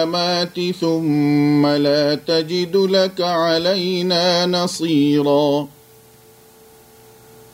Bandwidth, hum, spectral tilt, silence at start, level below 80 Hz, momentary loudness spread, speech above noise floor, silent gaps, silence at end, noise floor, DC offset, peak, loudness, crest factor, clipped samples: 16 kHz; none; -5.5 dB/octave; 0 s; -62 dBFS; 4 LU; 30 dB; none; 1.85 s; -47 dBFS; under 0.1%; -4 dBFS; -17 LUFS; 14 dB; under 0.1%